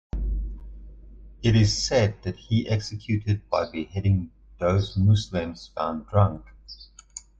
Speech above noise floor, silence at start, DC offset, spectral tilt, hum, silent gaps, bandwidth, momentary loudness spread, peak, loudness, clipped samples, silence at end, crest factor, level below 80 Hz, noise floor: 23 dB; 0.15 s; under 0.1%; -6 dB/octave; none; none; 8 kHz; 20 LU; -8 dBFS; -25 LUFS; under 0.1%; 0.2 s; 16 dB; -38 dBFS; -47 dBFS